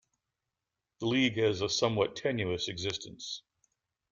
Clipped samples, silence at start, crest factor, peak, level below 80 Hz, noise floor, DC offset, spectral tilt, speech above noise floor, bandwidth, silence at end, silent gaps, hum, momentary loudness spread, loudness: under 0.1%; 1 s; 20 dB; -12 dBFS; -66 dBFS; -88 dBFS; under 0.1%; -4.5 dB/octave; 57 dB; 7.6 kHz; 0.75 s; none; none; 12 LU; -31 LUFS